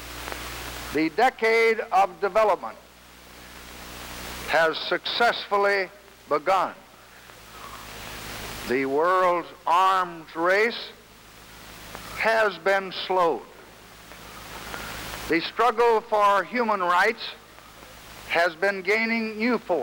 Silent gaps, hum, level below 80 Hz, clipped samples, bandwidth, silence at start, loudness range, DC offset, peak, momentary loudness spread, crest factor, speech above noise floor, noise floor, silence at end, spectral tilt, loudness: none; none; -52 dBFS; under 0.1%; over 20 kHz; 0 s; 4 LU; under 0.1%; -8 dBFS; 20 LU; 18 dB; 26 dB; -48 dBFS; 0 s; -3.5 dB/octave; -24 LUFS